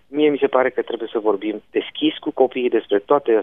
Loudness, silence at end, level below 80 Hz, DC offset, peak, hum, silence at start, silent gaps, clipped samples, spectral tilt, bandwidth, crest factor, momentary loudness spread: -20 LUFS; 0 s; -68 dBFS; 0.2%; -2 dBFS; none; 0.1 s; none; under 0.1%; -8 dB/octave; 3.9 kHz; 18 dB; 7 LU